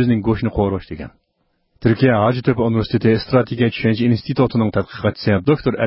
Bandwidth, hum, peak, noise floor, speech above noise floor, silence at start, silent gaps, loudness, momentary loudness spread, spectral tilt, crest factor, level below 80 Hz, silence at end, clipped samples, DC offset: 5.8 kHz; none; -2 dBFS; -67 dBFS; 50 dB; 0 s; none; -18 LUFS; 7 LU; -12 dB/octave; 16 dB; -40 dBFS; 0 s; under 0.1%; under 0.1%